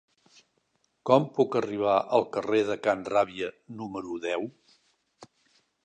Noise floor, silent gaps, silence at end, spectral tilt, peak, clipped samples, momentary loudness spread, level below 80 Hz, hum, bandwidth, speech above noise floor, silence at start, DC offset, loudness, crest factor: -73 dBFS; none; 0.6 s; -6 dB/octave; -4 dBFS; under 0.1%; 13 LU; -70 dBFS; none; 9.4 kHz; 46 dB; 1.05 s; under 0.1%; -27 LUFS; 24 dB